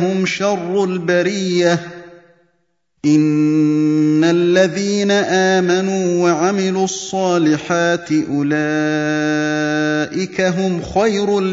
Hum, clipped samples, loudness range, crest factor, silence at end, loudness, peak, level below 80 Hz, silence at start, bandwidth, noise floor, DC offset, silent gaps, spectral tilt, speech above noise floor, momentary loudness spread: none; under 0.1%; 3 LU; 16 dB; 0 s; -16 LUFS; 0 dBFS; -52 dBFS; 0 s; 7.8 kHz; -67 dBFS; under 0.1%; none; -5.5 dB/octave; 52 dB; 5 LU